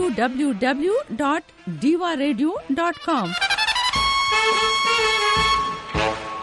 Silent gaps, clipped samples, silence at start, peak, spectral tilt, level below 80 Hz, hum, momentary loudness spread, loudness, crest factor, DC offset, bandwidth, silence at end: none; under 0.1%; 0 s; -6 dBFS; -3.5 dB/octave; -44 dBFS; none; 6 LU; -20 LUFS; 14 dB; under 0.1%; 11.5 kHz; 0 s